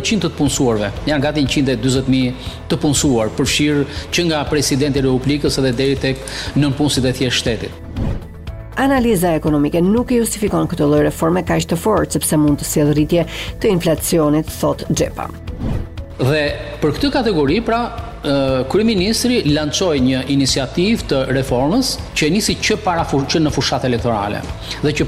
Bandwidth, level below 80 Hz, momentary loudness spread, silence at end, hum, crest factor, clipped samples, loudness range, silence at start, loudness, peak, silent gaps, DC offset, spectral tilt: 16 kHz; -32 dBFS; 8 LU; 0 s; none; 12 dB; under 0.1%; 3 LU; 0 s; -17 LUFS; -4 dBFS; none; under 0.1%; -5 dB/octave